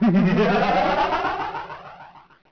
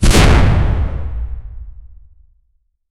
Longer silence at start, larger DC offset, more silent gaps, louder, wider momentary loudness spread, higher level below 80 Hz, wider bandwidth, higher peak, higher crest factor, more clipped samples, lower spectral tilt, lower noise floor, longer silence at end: about the same, 0 s vs 0 s; neither; neither; second, -20 LUFS vs -15 LUFS; second, 19 LU vs 23 LU; second, -46 dBFS vs -18 dBFS; second, 5.4 kHz vs 14.5 kHz; second, -12 dBFS vs 0 dBFS; about the same, 10 dB vs 14 dB; neither; first, -7.5 dB/octave vs -5 dB/octave; second, -45 dBFS vs -61 dBFS; second, 0.35 s vs 1.05 s